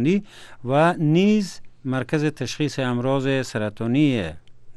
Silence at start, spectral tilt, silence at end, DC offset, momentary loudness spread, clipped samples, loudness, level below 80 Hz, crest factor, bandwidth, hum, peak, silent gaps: 0 s; -6.5 dB/octave; 0.05 s; under 0.1%; 10 LU; under 0.1%; -22 LUFS; -52 dBFS; 16 dB; 12.5 kHz; none; -6 dBFS; none